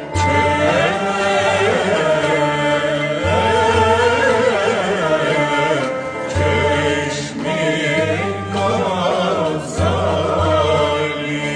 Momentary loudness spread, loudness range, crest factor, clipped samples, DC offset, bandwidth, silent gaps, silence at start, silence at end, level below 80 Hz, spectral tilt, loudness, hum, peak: 6 LU; 3 LU; 14 dB; under 0.1%; under 0.1%; 10 kHz; none; 0 s; 0 s; -40 dBFS; -5 dB/octave; -17 LUFS; none; -2 dBFS